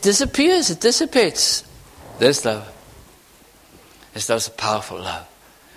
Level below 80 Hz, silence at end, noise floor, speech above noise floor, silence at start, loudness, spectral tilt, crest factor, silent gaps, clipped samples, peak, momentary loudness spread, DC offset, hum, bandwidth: -46 dBFS; 0.5 s; -50 dBFS; 31 dB; 0 s; -19 LUFS; -2.5 dB/octave; 20 dB; none; under 0.1%; -2 dBFS; 13 LU; under 0.1%; none; 16 kHz